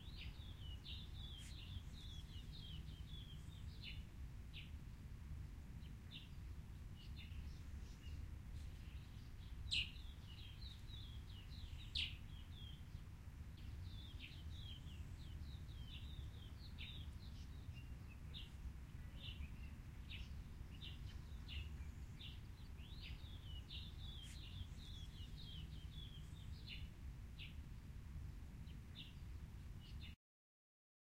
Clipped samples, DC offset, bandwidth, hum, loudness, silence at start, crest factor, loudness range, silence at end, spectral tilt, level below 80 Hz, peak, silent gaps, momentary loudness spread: under 0.1%; under 0.1%; 16 kHz; none; -54 LUFS; 0 s; 24 dB; 5 LU; 0.95 s; -4.5 dB/octave; -56 dBFS; -30 dBFS; none; 4 LU